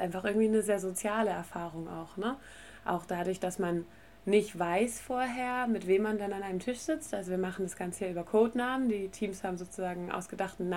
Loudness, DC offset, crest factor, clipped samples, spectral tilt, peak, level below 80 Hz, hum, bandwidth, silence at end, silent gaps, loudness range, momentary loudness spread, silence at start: -33 LUFS; 0.1%; 18 dB; under 0.1%; -5 dB/octave; -14 dBFS; -62 dBFS; none; 16.5 kHz; 0 s; none; 3 LU; 10 LU; 0 s